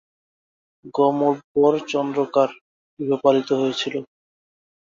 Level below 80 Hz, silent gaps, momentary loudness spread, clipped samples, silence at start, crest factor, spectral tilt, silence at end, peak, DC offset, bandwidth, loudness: -68 dBFS; 1.44-1.55 s, 2.61-2.97 s; 9 LU; under 0.1%; 0.85 s; 18 dB; -5.5 dB/octave; 0.8 s; -4 dBFS; under 0.1%; 7.6 kHz; -21 LUFS